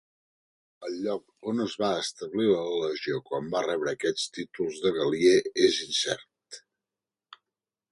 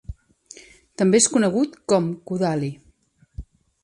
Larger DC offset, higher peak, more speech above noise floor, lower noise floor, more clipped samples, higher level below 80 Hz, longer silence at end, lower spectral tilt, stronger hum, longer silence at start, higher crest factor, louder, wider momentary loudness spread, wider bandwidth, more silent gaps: neither; second, -8 dBFS vs -4 dBFS; first, over 63 dB vs 39 dB; first, under -90 dBFS vs -59 dBFS; neither; second, -68 dBFS vs -46 dBFS; first, 1.35 s vs 0.4 s; about the same, -3.5 dB/octave vs -4.5 dB/octave; neither; first, 0.8 s vs 0.1 s; about the same, 20 dB vs 20 dB; second, -28 LUFS vs -21 LUFS; second, 13 LU vs 25 LU; about the same, 11.5 kHz vs 11.5 kHz; neither